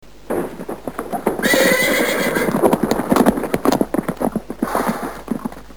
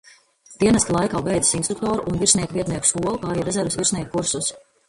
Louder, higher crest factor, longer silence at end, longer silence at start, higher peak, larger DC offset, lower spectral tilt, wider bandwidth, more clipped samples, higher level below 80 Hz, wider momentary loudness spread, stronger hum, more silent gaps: first, -18 LUFS vs -21 LUFS; about the same, 18 dB vs 20 dB; second, 0 s vs 0.3 s; second, 0.25 s vs 0.5 s; about the same, 0 dBFS vs -2 dBFS; first, 1% vs under 0.1%; about the same, -4.5 dB/octave vs -3.5 dB/octave; first, over 20 kHz vs 11.5 kHz; neither; about the same, -44 dBFS vs -46 dBFS; first, 12 LU vs 7 LU; neither; neither